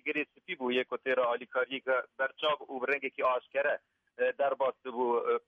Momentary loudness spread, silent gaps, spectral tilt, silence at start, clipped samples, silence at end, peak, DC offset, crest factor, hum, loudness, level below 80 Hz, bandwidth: 4 LU; none; -5.5 dB/octave; 0.05 s; under 0.1%; 0.1 s; -18 dBFS; under 0.1%; 14 dB; none; -32 LUFS; -84 dBFS; 5.6 kHz